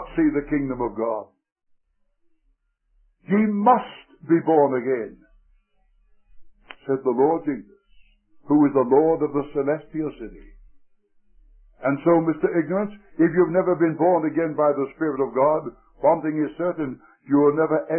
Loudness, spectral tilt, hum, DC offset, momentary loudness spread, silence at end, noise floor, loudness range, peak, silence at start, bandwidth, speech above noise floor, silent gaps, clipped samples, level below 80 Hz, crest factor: -22 LUFS; -12.5 dB/octave; none; under 0.1%; 12 LU; 0 s; -68 dBFS; 6 LU; -6 dBFS; 0 s; 3.3 kHz; 47 dB; 1.52-1.56 s; under 0.1%; -54 dBFS; 18 dB